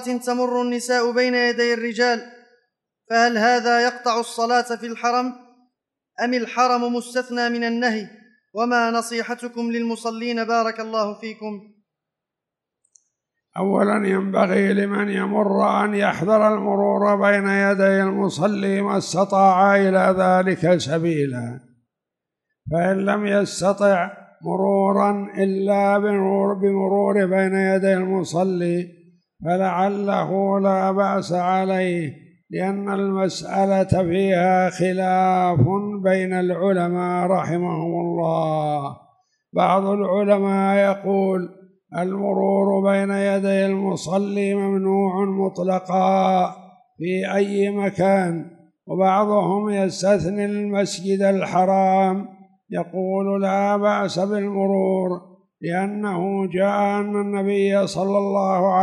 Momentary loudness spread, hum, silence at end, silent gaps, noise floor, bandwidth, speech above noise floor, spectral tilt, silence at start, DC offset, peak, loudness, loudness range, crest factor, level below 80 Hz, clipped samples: 9 LU; none; 0 s; none; -85 dBFS; 12 kHz; 66 dB; -6 dB/octave; 0 s; under 0.1%; -4 dBFS; -20 LUFS; 5 LU; 16 dB; -58 dBFS; under 0.1%